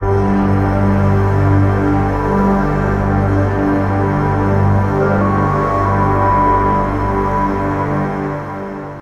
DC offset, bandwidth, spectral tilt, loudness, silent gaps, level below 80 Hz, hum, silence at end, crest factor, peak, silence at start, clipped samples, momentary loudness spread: under 0.1%; 6.6 kHz; -9.5 dB/octave; -15 LUFS; none; -26 dBFS; 50 Hz at -30 dBFS; 0 s; 12 dB; -2 dBFS; 0 s; under 0.1%; 5 LU